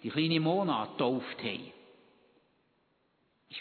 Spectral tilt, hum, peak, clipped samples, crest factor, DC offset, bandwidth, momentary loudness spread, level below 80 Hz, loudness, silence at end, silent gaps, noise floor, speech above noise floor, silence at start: -9 dB/octave; none; -14 dBFS; under 0.1%; 20 dB; under 0.1%; 4.6 kHz; 15 LU; -80 dBFS; -32 LUFS; 0 s; none; -74 dBFS; 42 dB; 0 s